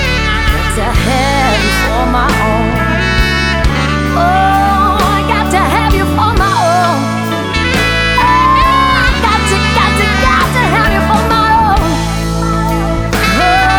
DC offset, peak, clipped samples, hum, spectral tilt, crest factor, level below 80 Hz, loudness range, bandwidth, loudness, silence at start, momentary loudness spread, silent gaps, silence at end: 0.1%; 0 dBFS; under 0.1%; none; -5 dB/octave; 10 dB; -18 dBFS; 2 LU; over 20 kHz; -11 LUFS; 0 s; 5 LU; none; 0 s